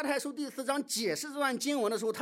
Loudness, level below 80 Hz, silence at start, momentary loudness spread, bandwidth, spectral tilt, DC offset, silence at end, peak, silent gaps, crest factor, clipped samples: -32 LUFS; -88 dBFS; 0 s; 4 LU; 16 kHz; -2.5 dB/octave; under 0.1%; 0 s; -18 dBFS; none; 16 dB; under 0.1%